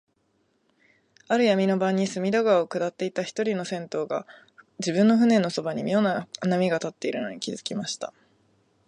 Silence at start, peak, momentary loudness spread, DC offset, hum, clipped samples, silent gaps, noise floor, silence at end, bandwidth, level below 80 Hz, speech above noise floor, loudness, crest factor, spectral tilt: 1.3 s; -8 dBFS; 11 LU; under 0.1%; none; under 0.1%; none; -70 dBFS; 0.8 s; 10.5 kHz; -74 dBFS; 45 dB; -25 LUFS; 18 dB; -5.5 dB/octave